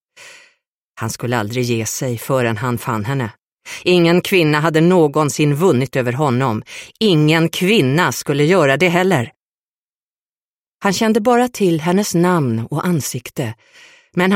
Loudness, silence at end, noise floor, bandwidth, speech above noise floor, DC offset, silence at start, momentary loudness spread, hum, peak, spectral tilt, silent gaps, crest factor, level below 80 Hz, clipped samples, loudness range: -16 LUFS; 0 s; under -90 dBFS; 16.5 kHz; over 74 dB; under 0.1%; 0.2 s; 11 LU; none; -2 dBFS; -5.5 dB/octave; 0.67-0.95 s, 3.42-3.57 s, 9.36-9.86 s, 9.94-10.77 s; 14 dB; -56 dBFS; under 0.1%; 4 LU